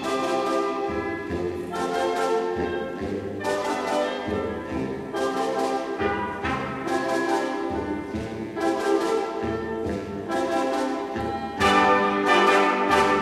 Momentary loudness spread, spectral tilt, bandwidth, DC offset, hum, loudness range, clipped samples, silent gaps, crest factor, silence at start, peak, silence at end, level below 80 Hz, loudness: 10 LU; -4.5 dB/octave; 14.5 kHz; under 0.1%; none; 5 LU; under 0.1%; none; 18 dB; 0 s; -6 dBFS; 0 s; -50 dBFS; -25 LUFS